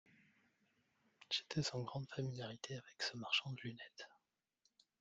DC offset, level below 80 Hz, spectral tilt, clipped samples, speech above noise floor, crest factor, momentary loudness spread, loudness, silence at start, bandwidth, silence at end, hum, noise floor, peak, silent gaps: under 0.1%; -80 dBFS; -4 dB/octave; under 0.1%; 39 dB; 24 dB; 15 LU; -43 LUFS; 1.2 s; 9.4 kHz; 0.85 s; none; -83 dBFS; -24 dBFS; none